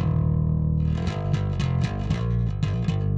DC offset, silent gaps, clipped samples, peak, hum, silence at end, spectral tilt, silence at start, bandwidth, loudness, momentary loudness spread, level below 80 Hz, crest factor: under 0.1%; none; under 0.1%; -10 dBFS; none; 0 s; -8 dB/octave; 0 s; 7.8 kHz; -25 LUFS; 3 LU; -32 dBFS; 12 dB